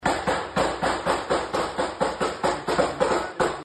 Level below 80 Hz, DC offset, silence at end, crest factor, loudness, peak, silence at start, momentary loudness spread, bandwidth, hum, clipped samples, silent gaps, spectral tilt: -46 dBFS; under 0.1%; 0 s; 16 dB; -25 LUFS; -8 dBFS; 0 s; 3 LU; 12 kHz; none; under 0.1%; none; -4 dB/octave